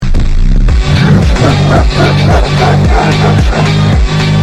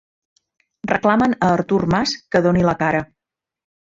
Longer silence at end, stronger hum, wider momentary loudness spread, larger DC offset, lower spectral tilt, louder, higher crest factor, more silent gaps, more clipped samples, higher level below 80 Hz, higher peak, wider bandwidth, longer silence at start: second, 0 s vs 0.85 s; neither; second, 3 LU vs 7 LU; neither; about the same, -6.5 dB/octave vs -6 dB/octave; first, -9 LUFS vs -18 LUFS; second, 6 dB vs 18 dB; neither; first, 0.2% vs under 0.1%; first, -12 dBFS vs -46 dBFS; about the same, 0 dBFS vs -2 dBFS; first, 11 kHz vs 7.6 kHz; second, 0 s vs 0.85 s